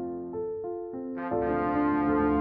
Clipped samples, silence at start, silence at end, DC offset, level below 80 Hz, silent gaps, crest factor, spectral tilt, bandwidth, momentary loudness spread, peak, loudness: under 0.1%; 0 s; 0 s; under 0.1%; -50 dBFS; none; 14 dB; -7.5 dB/octave; 4.4 kHz; 10 LU; -14 dBFS; -29 LUFS